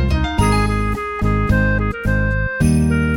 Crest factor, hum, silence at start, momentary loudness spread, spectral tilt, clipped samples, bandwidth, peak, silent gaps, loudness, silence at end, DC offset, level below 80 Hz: 14 dB; none; 0 s; 4 LU; -6.5 dB/octave; under 0.1%; 17 kHz; -4 dBFS; none; -18 LUFS; 0 s; under 0.1%; -22 dBFS